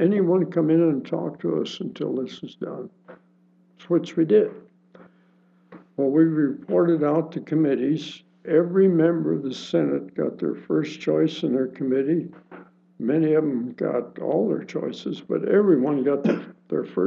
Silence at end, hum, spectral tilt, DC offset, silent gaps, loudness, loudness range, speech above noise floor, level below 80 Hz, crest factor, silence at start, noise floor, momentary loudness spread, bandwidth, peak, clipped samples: 0 s; none; -8 dB/octave; under 0.1%; none; -23 LUFS; 5 LU; 37 dB; -82 dBFS; 16 dB; 0 s; -59 dBFS; 11 LU; 7.2 kHz; -6 dBFS; under 0.1%